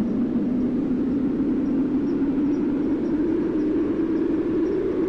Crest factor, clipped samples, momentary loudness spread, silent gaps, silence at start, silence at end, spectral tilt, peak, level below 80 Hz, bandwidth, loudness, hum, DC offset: 8 dB; under 0.1%; 1 LU; none; 0 s; 0 s; -9.5 dB/octave; -16 dBFS; -44 dBFS; 6 kHz; -23 LUFS; none; under 0.1%